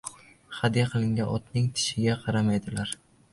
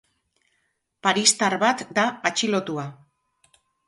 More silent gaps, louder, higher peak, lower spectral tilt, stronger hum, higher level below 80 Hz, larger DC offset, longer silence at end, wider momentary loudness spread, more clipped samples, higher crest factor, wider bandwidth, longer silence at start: neither; second, -27 LUFS vs -22 LUFS; second, -10 dBFS vs -2 dBFS; first, -5 dB/octave vs -2 dB/octave; neither; first, -54 dBFS vs -70 dBFS; neither; second, 0.4 s vs 0.95 s; second, 10 LU vs 13 LU; neither; about the same, 18 dB vs 22 dB; about the same, 11.5 kHz vs 11.5 kHz; second, 0.05 s vs 1.05 s